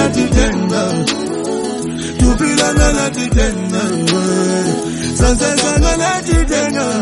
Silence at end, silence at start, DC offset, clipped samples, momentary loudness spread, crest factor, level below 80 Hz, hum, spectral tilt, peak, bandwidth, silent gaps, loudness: 0 s; 0 s; under 0.1%; under 0.1%; 7 LU; 14 dB; -20 dBFS; none; -4.5 dB/octave; 0 dBFS; 11.5 kHz; none; -15 LUFS